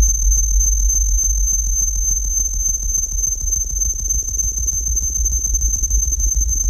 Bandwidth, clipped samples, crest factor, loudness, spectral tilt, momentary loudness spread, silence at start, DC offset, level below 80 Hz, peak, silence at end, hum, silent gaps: 15.5 kHz; under 0.1%; 12 dB; -17 LUFS; -2.5 dB/octave; 3 LU; 0 s; under 0.1%; -20 dBFS; -4 dBFS; 0 s; none; none